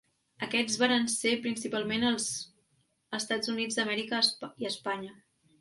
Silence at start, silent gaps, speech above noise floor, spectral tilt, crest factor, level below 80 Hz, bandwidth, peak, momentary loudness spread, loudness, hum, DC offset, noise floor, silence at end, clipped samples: 0.4 s; none; 42 dB; -2 dB/octave; 20 dB; -72 dBFS; 11.5 kHz; -12 dBFS; 12 LU; -30 LUFS; none; under 0.1%; -73 dBFS; 0.5 s; under 0.1%